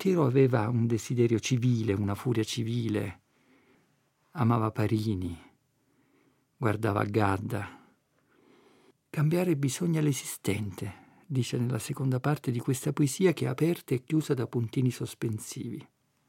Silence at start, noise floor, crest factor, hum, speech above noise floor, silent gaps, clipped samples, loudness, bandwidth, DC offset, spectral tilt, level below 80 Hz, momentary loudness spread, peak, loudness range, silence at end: 0 s; -70 dBFS; 20 dB; none; 42 dB; none; under 0.1%; -29 LUFS; 16.5 kHz; under 0.1%; -6.5 dB/octave; -70 dBFS; 11 LU; -10 dBFS; 4 LU; 0.45 s